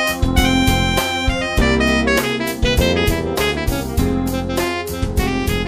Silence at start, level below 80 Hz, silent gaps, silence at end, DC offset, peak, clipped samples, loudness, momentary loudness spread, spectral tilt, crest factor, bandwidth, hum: 0 s; -24 dBFS; none; 0 s; under 0.1%; -2 dBFS; under 0.1%; -17 LUFS; 6 LU; -4.5 dB/octave; 14 dB; 15.5 kHz; none